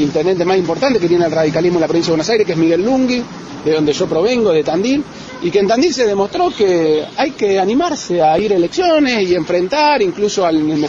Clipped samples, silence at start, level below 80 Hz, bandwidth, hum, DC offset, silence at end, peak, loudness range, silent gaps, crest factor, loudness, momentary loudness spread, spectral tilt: under 0.1%; 0 s; -48 dBFS; 7.8 kHz; none; under 0.1%; 0 s; -2 dBFS; 1 LU; none; 12 dB; -14 LUFS; 4 LU; -5 dB/octave